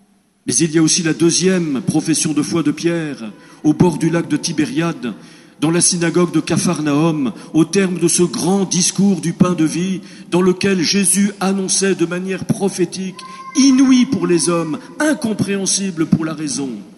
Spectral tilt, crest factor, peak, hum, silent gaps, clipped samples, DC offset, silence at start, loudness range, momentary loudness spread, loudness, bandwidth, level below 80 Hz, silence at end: -4.5 dB/octave; 16 dB; 0 dBFS; none; none; under 0.1%; under 0.1%; 0.45 s; 2 LU; 9 LU; -16 LUFS; 13 kHz; -54 dBFS; 0.05 s